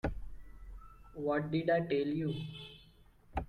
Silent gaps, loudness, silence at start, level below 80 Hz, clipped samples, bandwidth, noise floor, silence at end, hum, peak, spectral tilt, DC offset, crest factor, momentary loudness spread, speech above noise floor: none; -35 LUFS; 0.05 s; -50 dBFS; under 0.1%; 10.5 kHz; -61 dBFS; 0 s; none; -20 dBFS; -8.5 dB/octave; under 0.1%; 18 dB; 23 LU; 28 dB